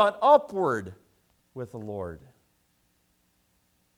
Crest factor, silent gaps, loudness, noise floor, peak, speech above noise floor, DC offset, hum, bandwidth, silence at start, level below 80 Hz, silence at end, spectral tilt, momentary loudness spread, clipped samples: 22 dB; none; -25 LUFS; -70 dBFS; -6 dBFS; 45 dB; under 0.1%; none; 12 kHz; 0 s; -64 dBFS; 1.8 s; -6 dB/octave; 25 LU; under 0.1%